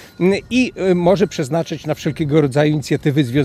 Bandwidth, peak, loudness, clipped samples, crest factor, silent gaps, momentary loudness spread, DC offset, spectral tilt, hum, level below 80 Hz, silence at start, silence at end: 14.5 kHz; -2 dBFS; -17 LUFS; under 0.1%; 14 dB; none; 7 LU; under 0.1%; -6.5 dB/octave; none; -46 dBFS; 0 s; 0 s